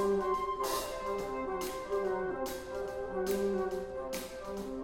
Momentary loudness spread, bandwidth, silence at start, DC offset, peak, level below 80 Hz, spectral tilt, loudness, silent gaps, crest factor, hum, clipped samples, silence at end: 7 LU; 17 kHz; 0 s; under 0.1%; -20 dBFS; -54 dBFS; -4.5 dB/octave; -36 LUFS; none; 14 dB; none; under 0.1%; 0 s